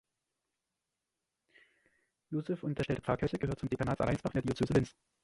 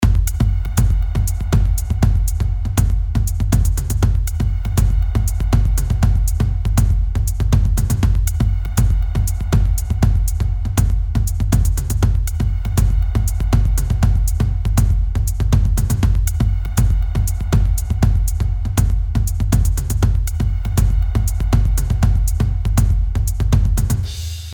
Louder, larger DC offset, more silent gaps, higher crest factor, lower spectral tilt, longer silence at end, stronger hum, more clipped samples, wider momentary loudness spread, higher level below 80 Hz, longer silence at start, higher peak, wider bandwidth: second, -35 LUFS vs -18 LUFS; neither; neither; first, 22 dB vs 14 dB; first, -7.5 dB/octave vs -6 dB/octave; first, 0.35 s vs 0 s; neither; neither; first, 7 LU vs 3 LU; second, -54 dBFS vs -18 dBFS; first, 2.3 s vs 0 s; second, -14 dBFS vs -2 dBFS; second, 11.5 kHz vs 19.5 kHz